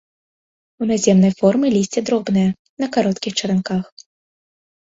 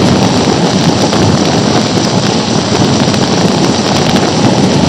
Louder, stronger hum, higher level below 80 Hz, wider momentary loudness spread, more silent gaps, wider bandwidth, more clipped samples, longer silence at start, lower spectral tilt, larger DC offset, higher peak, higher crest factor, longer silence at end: second, -18 LUFS vs -9 LUFS; neither; second, -56 dBFS vs -36 dBFS; first, 11 LU vs 2 LU; first, 2.59-2.77 s vs none; second, 7.8 kHz vs 15 kHz; second, under 0.1% vs 0.4%; first, 0.8 s vs 0 s; about the same, -5.5 dB/octave vs -5 dB/octave; second, under 0.1% vs 0.6%; about the same, 0 dBFS vs 0 dBFS; first, 18 dB vs 10 dB; first, 1.05 s vs 0 s